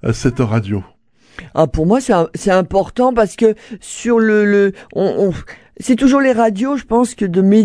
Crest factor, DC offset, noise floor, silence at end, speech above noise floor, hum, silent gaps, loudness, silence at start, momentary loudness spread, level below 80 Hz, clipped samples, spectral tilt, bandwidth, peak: 14 dB; 0.1%; -39 dBFS; 0 s; 25 dB; none; none; -15 LUFS; 0 s; 11 LU; -36 dBFS; under 0.1%; -6.5 dB/octave; 11 kHz; 0 dBFS